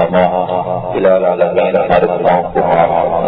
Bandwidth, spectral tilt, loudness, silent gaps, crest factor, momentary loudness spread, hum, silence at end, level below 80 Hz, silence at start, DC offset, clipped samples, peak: 5 kHz; -10 dB/octave; -12 LUFS; none; 12 dB; 5 LU; none; 0 s; -40 dBFS; 0 s; under 0.1%; under 0.1%; 0 dBFS